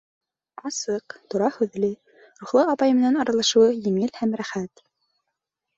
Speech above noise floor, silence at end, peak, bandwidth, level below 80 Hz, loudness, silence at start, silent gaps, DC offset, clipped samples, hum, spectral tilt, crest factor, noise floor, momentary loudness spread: 60 dB; 1.1 s; -6 dBFS; 8.2 kHz; -66 dBFS; -22 LUFS; 0.65 s; none; under 0.1%; under 0.1%; none; -4.5 dB/octave; 18 dB; -82 dBFS; 14 LU